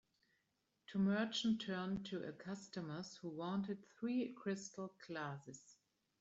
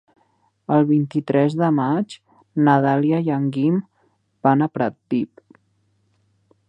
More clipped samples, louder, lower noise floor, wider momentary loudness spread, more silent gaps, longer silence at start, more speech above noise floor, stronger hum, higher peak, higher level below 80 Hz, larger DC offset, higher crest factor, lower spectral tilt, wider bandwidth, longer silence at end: neither; second, -44 LUFS vs -20 LUFS; first, -85 dBFS vs -65 dBFS; about the same, 12 LU vs 10 LU; neither; first, 0.9 s vs 0.7 s; second, 42 dB vs 47 dB; neither; second, -28 dBFS vs -2 dBFS; second, -78 dBFS vs -70 dBFS; neither; about the same, 16 dB vs 20 dB; second, -5.5 dB/octave vs -9 dB/octave; second, 8 kHz vs 9 kHz; second, 0.5 s vs 1.45 s